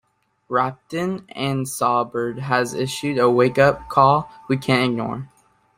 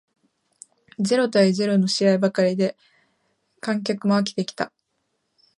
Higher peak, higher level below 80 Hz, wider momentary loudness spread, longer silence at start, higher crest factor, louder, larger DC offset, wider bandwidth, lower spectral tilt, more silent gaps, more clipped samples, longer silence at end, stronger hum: first, -2 dBFS vs -6 dBFS; first, -54 dBFS vs -72 dBFS; about the same, 10 LU vs 11 LU; second, 0.5 s vs 1 s; about the same, 18 dB vs 18 dB; about the same, -20 LUFS vs -22 LUFS; neither; first, 16 kHz vs 11.5 kHz; about the same, -5.5 dB/octave vs -5.5 dB/octave; neither; neither; second, 0.5 s vs 0.9 s; neither